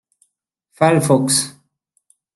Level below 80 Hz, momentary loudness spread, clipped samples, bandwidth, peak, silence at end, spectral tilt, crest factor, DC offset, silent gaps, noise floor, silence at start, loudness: -62 dBFS; 5 LU; under 0.1%; 12.5 kHz; -2 dBFS; 0.85 s; -4.5 dB/octave; 18 dB; under 0.1%; none; -71 dBFS; 0.8 s; -16 LUFS